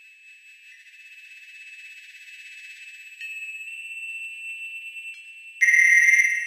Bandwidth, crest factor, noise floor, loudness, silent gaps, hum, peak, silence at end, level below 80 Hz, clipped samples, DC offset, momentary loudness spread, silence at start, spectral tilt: 15 kHz; 20 dB; -50 dBFS; -20 LUFS; none; none; -6 dBFS; 0 s; under -90 dBFS; under 0.1%; under 0.1%; 28 LU; 1.1 s; 12 dB/octave